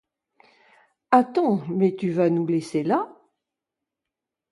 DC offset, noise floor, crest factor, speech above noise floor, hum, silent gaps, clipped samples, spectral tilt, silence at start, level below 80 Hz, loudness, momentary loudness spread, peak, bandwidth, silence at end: under 0.1%; -86 dBFS; 22 dB; 65 dB; none; none; under 0.1%; -8 dB/octave; 1.1 s; -72 dBFS; -22 LUFS; 5 LU; -2 dBFS; 11.5 kHz; 1.4 s